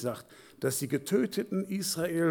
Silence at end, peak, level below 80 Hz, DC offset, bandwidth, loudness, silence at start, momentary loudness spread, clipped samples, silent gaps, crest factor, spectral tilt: 0 s; -14 dBFS; -70 dBFS; under 0.1%; 19 kHz; -31 LUFS; 0 s; 7 LU; under 0.1%; none; 16 dB; -4.5 dB/octave